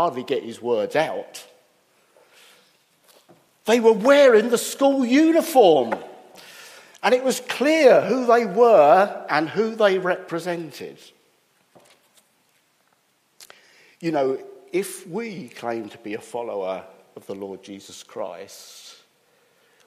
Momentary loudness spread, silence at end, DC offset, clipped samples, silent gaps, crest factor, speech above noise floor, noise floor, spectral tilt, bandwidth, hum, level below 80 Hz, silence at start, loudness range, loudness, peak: 23 LU; 1.05 s; under 0.1%; under 0.1%; none; 20 dB; 45 dB; -65 dBFS; -4.5 dB/octave; 15.5 kHz; none; -78 dBFS; 0 s; 16 LU; -20 LUFS; -2 dBFS